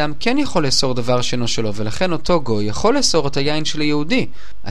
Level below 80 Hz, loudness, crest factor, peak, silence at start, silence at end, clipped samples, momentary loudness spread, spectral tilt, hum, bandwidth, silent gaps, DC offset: -38 dBFS; -18 LUFS; 16 dB; 0 dBFS; 0 s; 0 s; under 0.1%; 6 LU; -4 dB/octave; none; 13.5 kHz; none; 10%